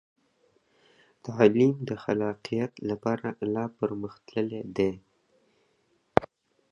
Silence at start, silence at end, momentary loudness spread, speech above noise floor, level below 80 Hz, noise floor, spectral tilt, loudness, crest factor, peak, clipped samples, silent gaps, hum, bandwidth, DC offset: 1.25 s; 0.45 s; 11 LU; 43 dB; -60 dBFS; -70 dBFS; -7.5 dB/octave; -28 LUFS; 30 dB; 0 dBFS; under 0.1%; none; none; 7.2 kHz; under 0.1%